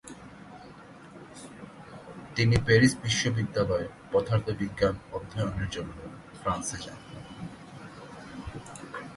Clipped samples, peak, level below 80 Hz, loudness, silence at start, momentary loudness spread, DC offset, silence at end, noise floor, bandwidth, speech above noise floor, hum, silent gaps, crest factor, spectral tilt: under 0.1%; -8 dBFS; -48 dBFS; -28 LUFS; 0.05 s; 23 LU; under 0.1%; 0 s; -48 dBFS; 11.5 kHz; 21 dB; none; none; 22 dB; -5 dB/octave